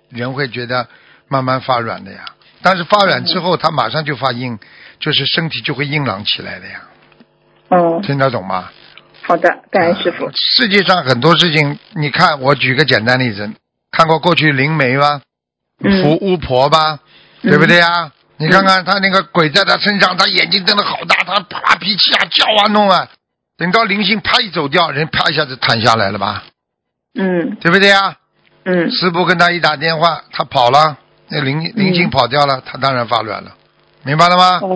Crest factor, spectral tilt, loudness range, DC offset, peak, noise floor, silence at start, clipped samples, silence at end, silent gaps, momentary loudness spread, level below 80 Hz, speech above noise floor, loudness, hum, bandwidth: 14 dB; -5 dB/octave; 5 LU; under 0.1%; 0 dBFS; -76 dBFS; 0.1 s; 0.4%; 0 s; none; 11 LU; -48 dBFS; 63 dB; -12 LUFS; none; 8 kHz